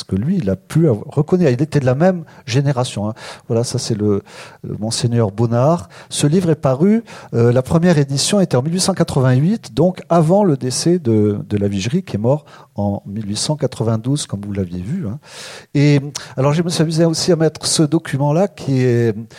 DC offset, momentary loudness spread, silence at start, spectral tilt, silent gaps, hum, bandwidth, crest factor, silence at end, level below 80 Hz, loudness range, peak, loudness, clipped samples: under 0.1%; 9 LU; 0 s; -6 dB/octave; none; none; 14.5 kHz; 14 dB; 0 s; -50 dBFS; 5 LU; -2 dBFS; -17 LUFS; under 0.1%